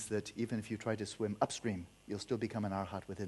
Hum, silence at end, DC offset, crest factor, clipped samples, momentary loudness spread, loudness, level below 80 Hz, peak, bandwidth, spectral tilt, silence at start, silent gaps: none; 0 s; under 0.1%; 22 dB; under 0.1%; 7 LU; -39 LUFS; -68 dBFS; -18 dBFS; 12 kHz; -5.5 dB/octave; 0 s; none